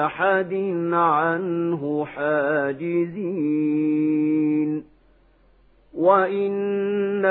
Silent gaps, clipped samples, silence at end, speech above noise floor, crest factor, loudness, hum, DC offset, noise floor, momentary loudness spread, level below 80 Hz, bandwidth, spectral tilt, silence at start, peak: none; under 0.1%; 0 s; 35 dB; 18 dB; -22 LUFS; none; under 0.1%; -57 dBFS; 6 LU; -64 dBFS; 4.1 kHz; -11.5 dB/octave; 0 s; -4 dBFS